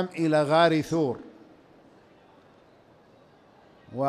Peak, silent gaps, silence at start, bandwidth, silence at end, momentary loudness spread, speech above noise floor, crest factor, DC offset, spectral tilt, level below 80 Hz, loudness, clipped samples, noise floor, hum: -10 dBFS; none; 0 s; 14 kHz; 0 s; 17 LU; 33 dB; 20 dB; under 0.1%; -6.5 dB/octave; -68 dBFS; -23 LUFS; under 0.1%; -57 dBFS; none